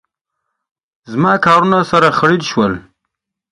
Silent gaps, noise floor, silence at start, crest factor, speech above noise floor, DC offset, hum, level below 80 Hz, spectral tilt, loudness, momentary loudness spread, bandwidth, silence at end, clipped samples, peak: none; -76 dBFS; 1.1 s; 16 dB; 64 dB; under 0.1%; none; -50 dBFS; -6 dB/octave; -12 LUFS; 9 LU; 11.5 kHz; 0.7 s; under 0.1%; 0 dBFS